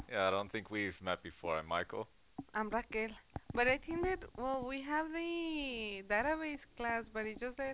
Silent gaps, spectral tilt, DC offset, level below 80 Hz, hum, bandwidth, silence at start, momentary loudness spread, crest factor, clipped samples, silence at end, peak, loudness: none; -2.5 dB/octave; under 0.1%; -58 dBFS; none; 4 kHz; 0 s; 8 LU; 20 dB; under 0.1%; 0 s; -18 dBFS; -38 LUFS